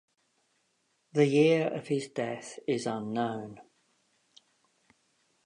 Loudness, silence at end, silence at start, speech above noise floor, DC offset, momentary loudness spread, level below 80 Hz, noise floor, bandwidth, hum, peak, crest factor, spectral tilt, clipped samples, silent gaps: -29 LUFS; 1.85 s; 1.15 s; 46 dB; under 0.1%; 13 LU; -80 dBFS; -75 dBFS; 10.5 kHz; none; -10 dBFS; 22 dB; -6 dB/octave; under 0.1%; none